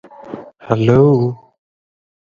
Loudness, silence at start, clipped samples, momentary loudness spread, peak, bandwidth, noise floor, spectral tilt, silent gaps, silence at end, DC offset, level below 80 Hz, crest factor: -14 LUFS; 0.25 s; under 0.1%; 22 LU; 0 dBFS; 7.2 kHz; -33 dBFS; -9.5 dB/octave; none; 1 s; under 0.1%; -46 dBFS; 16 dB